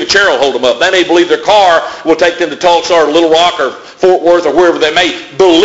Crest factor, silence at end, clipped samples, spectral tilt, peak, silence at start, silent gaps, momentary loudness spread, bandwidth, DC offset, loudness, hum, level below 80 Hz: 8 dB; 0 s; 0.4%; -3 dB/octave; 0 dBFS; 0 s; none; 5 LU; 8 kHz; under 0.1%; -9 LUFS; none; -44 dBFS